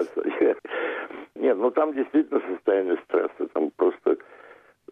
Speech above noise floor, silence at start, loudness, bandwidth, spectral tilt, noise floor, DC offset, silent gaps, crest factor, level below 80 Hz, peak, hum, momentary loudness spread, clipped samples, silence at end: 28 dB; 0 s; -25 LUFS; 5.6 kHz; -6.5 dB/octave; -51 dBFS; under 0.1%; none; 14 dB; -76 dBFS; -10 dBFS; none; 6 LU; under 0.1%; 0.55 s